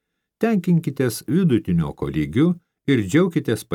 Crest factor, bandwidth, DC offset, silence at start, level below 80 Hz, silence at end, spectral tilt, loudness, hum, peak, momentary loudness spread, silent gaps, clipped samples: 16 dB; 16.5 kHz; under 0.1%; 0.4 s; -48 dBFS; 0 s; -7 dB/octave; -21 LUFS; none; -6 dBFS; 6 LU; none; under 0.1%